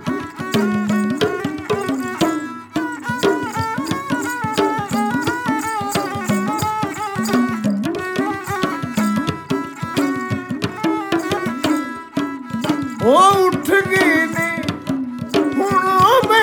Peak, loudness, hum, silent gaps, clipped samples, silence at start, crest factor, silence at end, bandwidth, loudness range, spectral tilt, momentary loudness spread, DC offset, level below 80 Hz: -2 dBFS; -19 LUFS; none; none; under 0.1%; 0 s; 16 dB; 0 s; 19 kHz; 5 LU; -5 dB/octave; 10 LU; under 0.1%; -52 dBFS